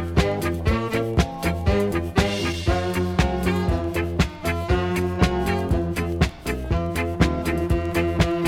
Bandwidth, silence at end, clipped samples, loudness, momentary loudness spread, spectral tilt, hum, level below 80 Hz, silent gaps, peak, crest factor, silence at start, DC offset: 17 kHz; 0 s; under 0.1%; -23 LUFS; 3 LU; -6 dB/octave; none; -30 dBFS; none; -4 dBFS; 18 dB; 0 s; under 0.1%